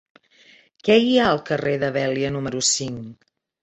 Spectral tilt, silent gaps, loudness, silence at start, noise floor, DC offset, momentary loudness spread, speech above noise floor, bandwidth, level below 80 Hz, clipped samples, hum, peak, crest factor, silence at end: -3.5 dB/octave; none; -20 LUFS; 0.85 s; -53 dBFS; under 0.1%; 13 LU; 33 dB; 8.2 kHz; -56 dBFS; under 0.1%; none; -4 dBFS; 18 dB; 0.5 s